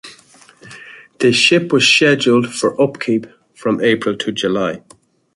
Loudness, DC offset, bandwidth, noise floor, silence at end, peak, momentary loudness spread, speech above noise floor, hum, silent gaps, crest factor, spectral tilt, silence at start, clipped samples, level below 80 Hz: -14 LUFS; under 0.1%; 11.5 kHz; -46 dBFS; 0.55 s; 0 dBFS; 12 LU; 32 dB; none; none; 16 dB; -4 dB/octave; 0.05 s; under 0.1%; -58 dBFS